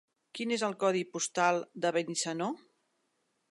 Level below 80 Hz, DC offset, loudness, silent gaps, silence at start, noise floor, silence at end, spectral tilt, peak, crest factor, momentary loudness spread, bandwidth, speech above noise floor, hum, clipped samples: -86 dBFS; under 0.1%; -32 LUFS; none; 0.35 s; -78 dBFS; 0.95 s; -3.5 dB/octave; -14 dBFS; 20 dB; 9 LU; 11.5 kHz; 46 dB; none; under 0.1%